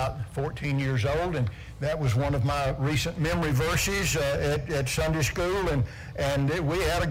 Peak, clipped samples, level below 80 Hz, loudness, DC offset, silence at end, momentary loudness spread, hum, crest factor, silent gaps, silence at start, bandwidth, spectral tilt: -14 dBFS; under 0.1%; -38 dBFS; -27 LUFS; under 0.1%; 0 s; 6 LU; none; 12 dB; none; 0 s; 16 kHz; -5 dB/octave